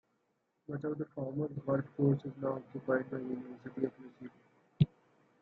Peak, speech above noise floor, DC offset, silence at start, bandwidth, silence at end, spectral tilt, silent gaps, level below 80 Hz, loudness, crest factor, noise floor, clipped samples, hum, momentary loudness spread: -14 dBFS; 43 dB; under 0.1%; 0.7 s; 4.3 kHz; 0.55 s; -11 dB/octave; none; -66 dBFS; -37 LUFS; 22 dB; -79 dBFS; under 0.1%; none; 18 LU